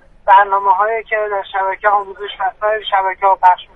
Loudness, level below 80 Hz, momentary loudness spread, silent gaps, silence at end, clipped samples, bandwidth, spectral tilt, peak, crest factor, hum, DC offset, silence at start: -14 LUFS; -50 dBFS; 9 LU; none; 0.1 s; under 0.1%; 4 kHz; -4 dB/octave; 0 dBFS; 14 dB; none; under 0.1%; 0.25 s